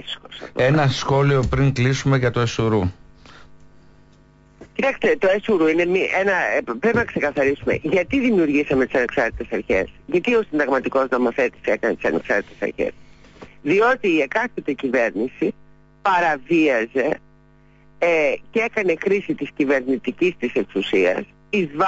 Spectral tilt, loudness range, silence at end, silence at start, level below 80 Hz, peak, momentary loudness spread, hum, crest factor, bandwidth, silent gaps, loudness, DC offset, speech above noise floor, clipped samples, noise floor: -6.5 dB/octave; 3 LU; 0 s; 0 s; -44 dBFS; -8 dBFS; 7 LU; none; 12 dB; 8 kHz; none; -20 LUFS; under 0.1%; 32 dB; under 0.1%; -52 dBFS